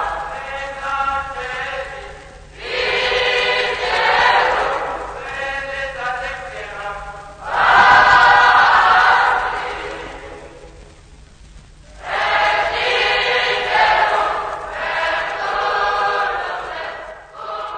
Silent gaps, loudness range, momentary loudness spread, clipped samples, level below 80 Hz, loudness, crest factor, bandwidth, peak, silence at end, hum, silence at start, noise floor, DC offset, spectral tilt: none; 10 LU; 19 LU; under 0.1%; -42 dBFS; -16 LUFS; 18 dB; 9.6 kHz; 0 dBFS; 0 s; none; 0 s; -43 dBFS; under 0.1%; -2 dB/octave